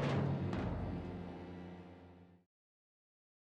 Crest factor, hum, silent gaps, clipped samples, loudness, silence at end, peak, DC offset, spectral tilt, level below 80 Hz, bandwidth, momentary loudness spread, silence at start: 18 dB; none; none; under 0.1%; -41 LUFS; 1.05 s; -24 dBFS; under 0.1%; -8 dB/octave; -56 dBFS; 8.2 kHz; 21 LU; 0 s